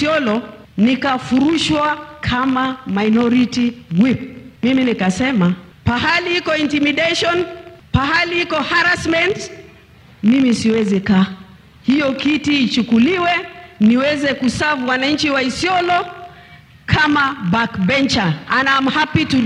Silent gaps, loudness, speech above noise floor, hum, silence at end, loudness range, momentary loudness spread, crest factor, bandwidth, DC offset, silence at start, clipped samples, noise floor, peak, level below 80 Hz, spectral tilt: none; -16 LUFS; 29 dB; none; 0 s; 1 LU; 7 LU; 16 dB; 11 kHz; under 0.1%; 0 s; under 0.1%; -44 dBFS; 0 dBFS; -42 dBFS; -5 dB/octave